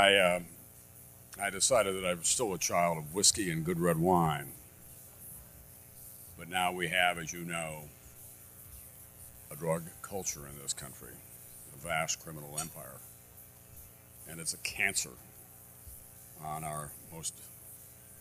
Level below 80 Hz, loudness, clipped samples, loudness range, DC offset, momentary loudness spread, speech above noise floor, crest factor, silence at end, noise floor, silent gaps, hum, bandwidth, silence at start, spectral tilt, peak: -62 dBFS; -32 LUFS; under 0.1%; 11 LU; under 0.1%; 24 LU; 22 dB; 26 dB; 0 s; -55 dBFS; none; 60 Hz at -60 dBFS; 15.5 kHz; 0 s; -2.5 dB/octave; -10 dBFS